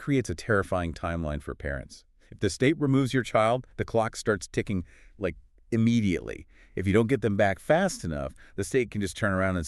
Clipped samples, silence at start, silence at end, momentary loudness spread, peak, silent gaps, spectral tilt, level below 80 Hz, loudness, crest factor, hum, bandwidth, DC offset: under 0.1%; 0 s; 0 s; 11 LU; -10 dBFS; none; -6 dB/octave; -46 dBFS; -28 LUFS; 18 dB; none; 13 kHz; under 0.1%